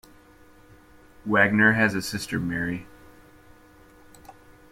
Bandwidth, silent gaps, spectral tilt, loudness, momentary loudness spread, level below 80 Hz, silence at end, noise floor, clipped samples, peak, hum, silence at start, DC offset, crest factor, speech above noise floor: 16 kHz; none; -5.5 dB/octave; -23 LUFS; 14 LU; -56 dBFS; 0.4 s; -53 dBFS; under 0.1%; -4 dBFS; none; 1.25 s; under 0.1%; 22 dB; 30 dB